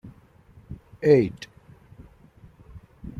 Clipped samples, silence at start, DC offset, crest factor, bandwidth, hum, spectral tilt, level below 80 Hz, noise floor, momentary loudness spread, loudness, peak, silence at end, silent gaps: under 0.1%; 0.05 s; under 0.1%; 22 dB; 7.2 kHz; none; -8 dB/octave; -52 dBFS; -53 dBFS; 25 LU; -21 LUFS; -6 dBFS; 0 s; none